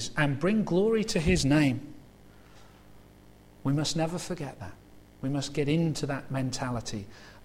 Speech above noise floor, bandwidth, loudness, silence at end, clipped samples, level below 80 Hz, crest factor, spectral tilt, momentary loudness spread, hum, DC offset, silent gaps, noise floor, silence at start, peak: 26 dB; 15.5 kHz; -29 LUFS; 0 s; under 0.1%; -48 dBFS; 18 dB; -5.5 dB/octave; 14 LU; 50 Hz at -50 dBFS; under 0.1%; none; -54 dBFS; 0 s; -12 dBFS